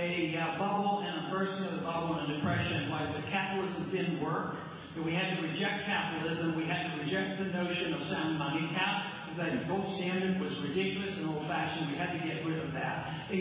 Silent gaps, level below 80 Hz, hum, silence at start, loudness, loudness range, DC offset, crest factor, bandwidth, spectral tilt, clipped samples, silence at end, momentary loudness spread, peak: none; -62 dBFS; none; 0 s; -34 LUFS; 1 LU; under 0.1%; 14 dB; 4 kHz; -4 dB/octave; under 0.1%; 0 s; 4 LU; -20 dBFS